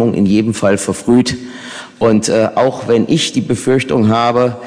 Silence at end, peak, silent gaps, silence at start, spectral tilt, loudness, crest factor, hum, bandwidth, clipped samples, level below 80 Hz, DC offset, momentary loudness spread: 0 s; 0 dBFS; none; 0 s; -5.5 dB/octave; -13 LUFS; 12 dB; none; 10.5 kHz; under 0.1%; -46 dBFS; under 0.1%; 7 LU